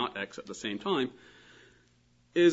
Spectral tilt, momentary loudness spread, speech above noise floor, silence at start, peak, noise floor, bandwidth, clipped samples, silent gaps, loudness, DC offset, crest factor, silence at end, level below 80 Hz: -5 dB/octave; 19 LU; 31 dB; 0 s; -12 dBFS; -66 dBFS; 8 kHz; under 0.1%; none; -33 LUFS; under 0.1%; 20 dB; 0 s; -72 dBFS